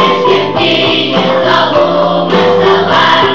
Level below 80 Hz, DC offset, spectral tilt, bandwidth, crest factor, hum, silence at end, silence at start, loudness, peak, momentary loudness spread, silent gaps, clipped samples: -46 dBFS; 2%; -5.5 dB/octave; 7.6 kHz; 8 dB; none; 0 s; 0 s; -9 LUFS; 0 dBFS; 3 LU; none; 0.1%